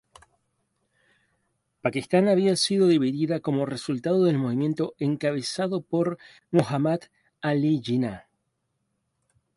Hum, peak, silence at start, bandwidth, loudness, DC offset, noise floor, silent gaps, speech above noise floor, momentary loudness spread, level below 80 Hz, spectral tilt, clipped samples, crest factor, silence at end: none; -6 dBFS; 1.85 s; 11.5 kHz; -25 LUFS; under 0.1%; -77 dBFS; none; 53 dB; 8 LU; -66 dBFS; -6 dB/octave; under 0.1%; 20 dB; 1.35 s